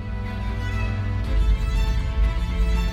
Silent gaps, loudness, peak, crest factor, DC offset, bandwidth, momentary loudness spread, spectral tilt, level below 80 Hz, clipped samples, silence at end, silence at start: none; -25 LUFS; -10 dBFS; 12 dB; under 0.1%; 8.2 kHz; 5 LU; -6.5 dB/octave; -22 dBFS; under 0.1%; 0 s; 0 s